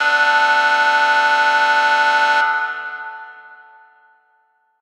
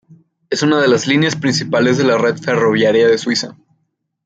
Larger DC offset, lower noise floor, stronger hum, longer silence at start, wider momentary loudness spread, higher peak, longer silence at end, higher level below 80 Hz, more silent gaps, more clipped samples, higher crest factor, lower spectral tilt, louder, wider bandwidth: neither; second, -61 dBFS vs -68 dBFS; neither; second, 0 s vs 0.5 s; first, 15 LU vs 6 LU; about the same, -4 dBFS vs -2 dBFS; first, 1.25 s vs 0.75 s; second, under -90 dBFS vs -60 dBFS; neither; neither; about the same, 14 dB vs 12 dB; second, 1.5 dB/octave vs -5 dB/octave; about the same, -14 LUFS vs -14 LUFS; first, 13 kHz vs 9 kHz